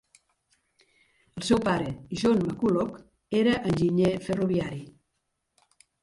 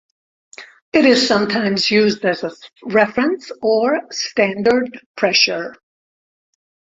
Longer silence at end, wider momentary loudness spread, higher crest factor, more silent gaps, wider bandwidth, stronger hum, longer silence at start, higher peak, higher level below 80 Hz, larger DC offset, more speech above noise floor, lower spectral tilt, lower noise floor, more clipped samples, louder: about the same, 1.15 s vs 1.2 s; about the same, 11 LU vs 11 LU; about the same, 18 dB vs 16 dB; second, none vs 0.82-0.92 s, 5.06-5.14 s; first, 11.5 kHz vs 8 kHz; neither; first, 1.35 s vs 0.6 s; second, -10 dBFS vs -2 dBFS; about the same, -54 dBFS vs -58 dBFS; neither; second, 53 dB vs over 73 dB; first, -6.5 dB/octave vs -4 dB/octave; second, -79 dBFS vs under -90 dBFS; neither; second, -26 LUFS vs -16 LUFS